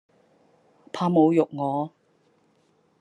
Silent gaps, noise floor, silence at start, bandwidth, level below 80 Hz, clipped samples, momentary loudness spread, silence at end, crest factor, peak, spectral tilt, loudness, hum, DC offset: none; -65 dBFS; 0.95 s; 8.8 kHz; -76 dBFS; under 0.1%; 15 LU; 1.1 s; 18 dB; -8 dBFS; -8.5 dB/octave; -23 LUFS; none; under 0.1%